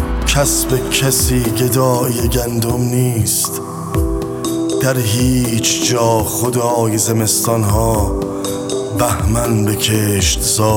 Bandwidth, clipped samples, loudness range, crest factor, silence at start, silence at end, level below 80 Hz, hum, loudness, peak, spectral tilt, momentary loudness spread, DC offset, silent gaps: 17.5 kHz; under 0.1%; 2 LU; 14 dB; 0 s; 0 s; -26 dBFS; none; -15 LUFS; 0 dBFS; -4.5 dB/octave; 6 LU; under 0.1%; none